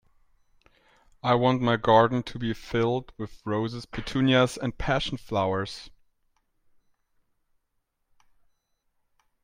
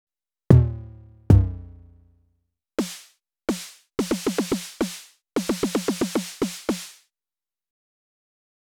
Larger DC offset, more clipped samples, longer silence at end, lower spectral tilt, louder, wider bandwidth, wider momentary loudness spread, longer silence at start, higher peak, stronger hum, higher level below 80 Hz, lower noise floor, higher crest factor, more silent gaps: neither; neither; first, 3.55 s vs 1.75 s; about the same, -6 dB/octave vs -6 dB/octave; about the same, -26 LUFS vs -24 LUFS; second, 16 kHz vs 18.5 kHz; second, 13 LU vs 18 LU; first, 1.25 s vs 0.5 s; second, -6 dBFS vs 0 dBFS; neither; second, -50 dBFS vs -36 dBFS; second, -77 dBFS vs under -90 dBFS; about the same, 22 dB vs 26 dB; neither